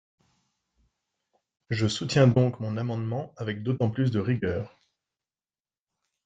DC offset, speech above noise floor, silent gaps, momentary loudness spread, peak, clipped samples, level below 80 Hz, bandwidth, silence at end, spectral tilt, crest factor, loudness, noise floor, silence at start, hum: under 0.1%; over 64 dB; none; 12 LU; -8 dBFS; under 0.1%; -62 dBFS; 8.4 kHz; 1.6 s; -6.5 dB/octave; 20 dB; -27 LUFS; under -90 dBFS; 1.7 s; none